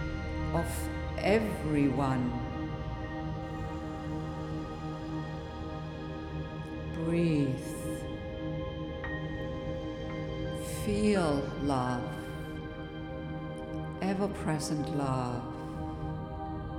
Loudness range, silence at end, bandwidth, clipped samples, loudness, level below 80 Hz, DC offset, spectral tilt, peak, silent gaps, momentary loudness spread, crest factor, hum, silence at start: 6 LU; 0 s; 17 kHz; under 0.1%; -34 LUFS; -44 dBFS; under 0.1%; -6.5 dB/octave; -14 dBFS; none; 11 LU; 18 dB; none; 0 s